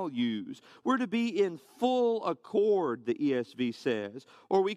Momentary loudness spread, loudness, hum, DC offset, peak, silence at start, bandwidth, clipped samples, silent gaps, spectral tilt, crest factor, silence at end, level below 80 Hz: 9 LU; -31 LUFS; none; under 0.1%; -14 dBFS; 0 s; 11.5 kHz; under 0.1%; none; -6 dB/octave; 16 dB; 0 s; -78 dBFS